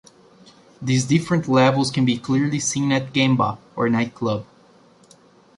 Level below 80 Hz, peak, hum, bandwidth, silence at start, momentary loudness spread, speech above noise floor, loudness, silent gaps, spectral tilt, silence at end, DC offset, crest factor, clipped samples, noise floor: -58 dBFS; -4 dBFS; none; 11.5 kHz; 0.8 s; 8 LU; 33 dB; -20 LUFS; none; -5 dB/octave; 1.15 s; under 0.1%; 16 dB; under 0.1%; -52 dBFS